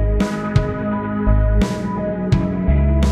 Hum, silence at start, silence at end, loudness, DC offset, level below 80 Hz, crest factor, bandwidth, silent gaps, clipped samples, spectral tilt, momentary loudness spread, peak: none; 0 s; 0 s; -19 LUFS; under 0.1%; -20 dBFS; 16 dB; 11 kHz; none; under 0.1%; -8 dB/octave; 5 LU; -2 dBFS